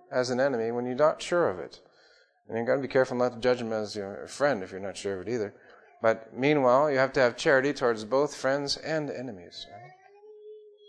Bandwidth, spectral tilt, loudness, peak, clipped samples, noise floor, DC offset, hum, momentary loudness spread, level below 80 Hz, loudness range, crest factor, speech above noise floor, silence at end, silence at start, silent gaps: 11 kHz; -5 dB/octave; -27 LUFS; -8 dBFS; under 0.1%; -61 dBFS; under 0.1%; none; 14 LU; -66 dBFS; 5 LU; 20 dB; 34 dB; 0.3 s; 0.1 s; none